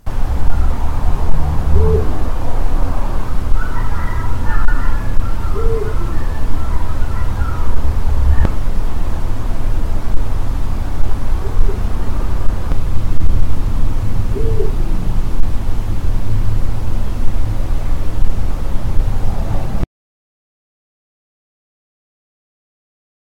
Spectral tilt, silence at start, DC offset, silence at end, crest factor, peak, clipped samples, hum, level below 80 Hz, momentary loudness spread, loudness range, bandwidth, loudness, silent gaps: -7.5 dB/octave; 0.05 s; under 0.1%; 3.5 s; 10 dB; 0 dBFS; 1%; none; -16 dBFS; 5 LU; 4 LU; 5.4 kHz; -21 LUFS; none